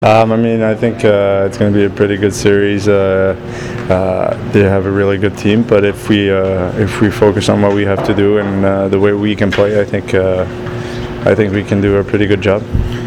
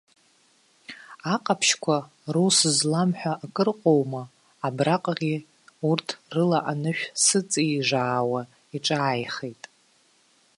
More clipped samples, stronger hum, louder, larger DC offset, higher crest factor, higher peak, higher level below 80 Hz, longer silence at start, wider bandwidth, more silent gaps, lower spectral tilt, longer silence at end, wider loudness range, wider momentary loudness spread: neither; neither; first, -12 LUFS vs -24 LUFS; neither; second, 12 dB vs 18 dB; first, 0 dBFS vs -6 dBFS; first, -32 dBFS vs -72 dBFS; second, 0 s vs 0.9 s; first, 14 kHz vs 11.5 kHz; neither; first, -6.5 dB/octave vs -3.5 dB/octave; second, 0 s vs 1.05 s; about the same, 2 LU vs 3 LU; second, 5 LU vs 13 LU